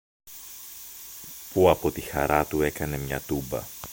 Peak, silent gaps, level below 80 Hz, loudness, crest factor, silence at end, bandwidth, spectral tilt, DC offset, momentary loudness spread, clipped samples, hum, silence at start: -4 dBFS; none; -44 dBFS; -26 LUFS; 22 dB; 0 s; 17 kHz; -5 dB/octave; under 0.1%; 18 LU; under 0.1%; none; 0.25 s